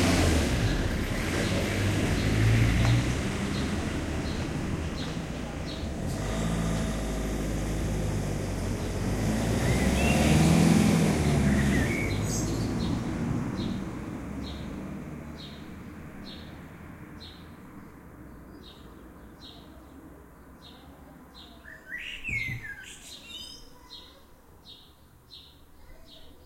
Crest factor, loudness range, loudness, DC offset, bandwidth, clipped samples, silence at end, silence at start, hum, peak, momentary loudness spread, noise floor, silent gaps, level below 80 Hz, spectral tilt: 18 dB; 22 LU; -28 LUFS; under 0.1%; 16.5 kHz; under 0.1%; 0.1 s; 0 s; none; -10 dBFS; 25 LU; -55 dBFS; none; -38 dBFS; -5.5 dB/octave